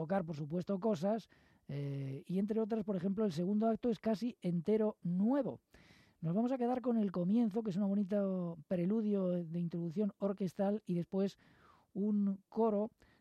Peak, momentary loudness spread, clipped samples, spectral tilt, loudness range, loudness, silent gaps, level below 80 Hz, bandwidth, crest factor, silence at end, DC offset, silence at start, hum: -24 dBFS; 7 LU; under 0.1%; -9 dB/octave; 3 LU; -36 LUFS; none; -76 dBFS; 8.6 kHz; 12 dB; 0.3 s; under 0.1%; 0 s; none